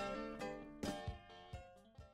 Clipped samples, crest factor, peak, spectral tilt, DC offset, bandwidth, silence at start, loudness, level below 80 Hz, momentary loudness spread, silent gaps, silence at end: under 0.1%; 18 dB; -30 dBFS; -5 dB/octave; under 0.1%; 16 kHz; 0 s; -49 LUFS; -60 dBFS; 12 LU; none; 0 s